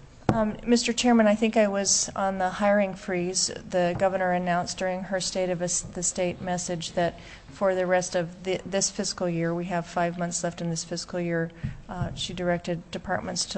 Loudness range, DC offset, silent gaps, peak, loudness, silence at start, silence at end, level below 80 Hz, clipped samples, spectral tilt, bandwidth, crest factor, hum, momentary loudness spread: 6 LU; under 0.1%; none; -2 dBFS; -26 LUFS; 0 s; 0 s; -50 dBFS; under 0.1%; -4 dB/octave; 8.6 kHz; 24 dB; none; 9 LU